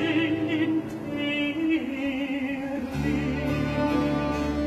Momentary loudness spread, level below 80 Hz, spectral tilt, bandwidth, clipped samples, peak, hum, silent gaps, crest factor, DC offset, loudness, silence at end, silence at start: 5 LU; -42 dBFS; -6.5 dB/octave; 13 kHz; under 0.1%; -12 dBFS; none; none; 14 dB; under 0.1%; -27 LUFS; 0 s; 0 s